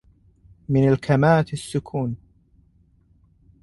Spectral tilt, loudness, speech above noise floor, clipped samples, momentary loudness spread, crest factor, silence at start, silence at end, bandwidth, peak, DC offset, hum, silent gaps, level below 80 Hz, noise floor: -7.5 dB/octave; -21 LUFS; 39 dB; under 0.1%; 14 LU; 18 dB; 0.7 s; 1.45 s; 11.5 kHz; -6 dBFS; under 0.1%; none; none; -50 dBFS; -58 dBFS